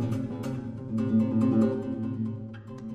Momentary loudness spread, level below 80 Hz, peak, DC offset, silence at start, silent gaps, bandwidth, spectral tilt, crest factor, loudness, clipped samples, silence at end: 13 LU; -58 dBFS; -12 dBFS; under 0.1%; 0 s; none; 8.4 kHz; -9.5 dB/octave; 16 dB; -28 LUFS; under 0.1%; 0 s